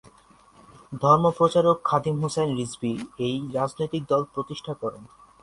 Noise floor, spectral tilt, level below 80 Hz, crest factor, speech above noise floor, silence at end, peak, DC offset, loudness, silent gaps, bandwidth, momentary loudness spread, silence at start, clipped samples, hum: -55 dBFS; -6.5 dB/octave; -60 dBFS; 20 dB; 31 dB; 0.35 s; -4 dBFS; under 0.1%; -24 LUFS; none; 11.5 kHz; 13 LU; 0.9 s; under 0.1%; none